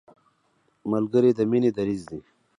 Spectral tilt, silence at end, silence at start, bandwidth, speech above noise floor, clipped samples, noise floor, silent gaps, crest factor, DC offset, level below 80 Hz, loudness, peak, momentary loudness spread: -8.5 dB/octave; 0.4 s; 0.85 s; 10.5 kHz; 45 dB; under 0.1%; -68 dBFS; none; 16 dB; under 0.1%; -62 dBFS; -23 LUFS; -8 dBFS; 18 LU